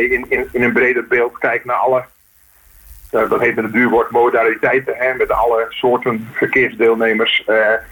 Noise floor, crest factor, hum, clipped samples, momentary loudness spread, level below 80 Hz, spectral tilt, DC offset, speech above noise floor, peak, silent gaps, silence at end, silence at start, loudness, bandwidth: -50 dBFS; 14 dB; none; under 0.1%; 5 LU; -46 dBFS; -5.5 dB/octave; under 0.1%; 35 dB; -2 dBFS; none; 0.05 s; 0 s; -15 LUFS; 19 kHz